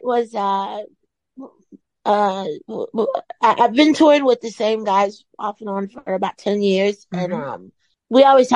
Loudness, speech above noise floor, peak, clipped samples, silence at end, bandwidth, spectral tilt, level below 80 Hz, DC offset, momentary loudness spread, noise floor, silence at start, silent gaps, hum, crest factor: -18 LUFS; 32 dB; -2 dBFS; under 0.1%; 0 s; 10.5 kHz; -5.5 dB/octave; -68 dBFS; under 0.1%; 15 LU; -50 dBFS; 0.05 s; none; none; 16 dB